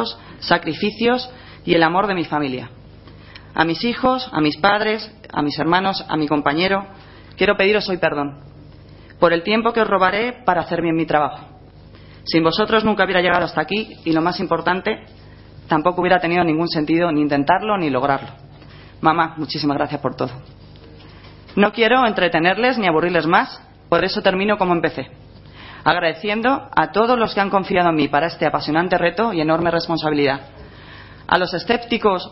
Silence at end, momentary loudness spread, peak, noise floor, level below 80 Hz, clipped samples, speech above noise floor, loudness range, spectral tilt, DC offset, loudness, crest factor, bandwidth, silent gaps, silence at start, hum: 0 s; 10 LU; 0 dBFS; -42 dBFS; -48 dBFS; under 0.1%; 24 dB; 3 LU; -9 dB/octave; under 0.1%; -18 LUFS; 20 dB; 6 kHz; none; 0 s; none